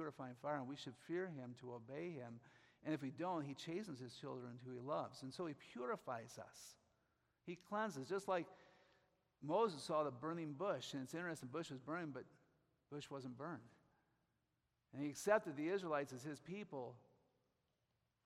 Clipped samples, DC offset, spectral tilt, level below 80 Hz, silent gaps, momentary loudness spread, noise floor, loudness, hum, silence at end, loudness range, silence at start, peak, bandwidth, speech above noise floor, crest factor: under 0.1%; under 0.1%; -5.5 dB/octave; -88 dBFS; none; 15 LU; -87 dBFS; -47 LUFS; none; 1.25 s; 6 LU; 0 s; -22 dBFS; 14.5 kHz; 41 dB; 24 dB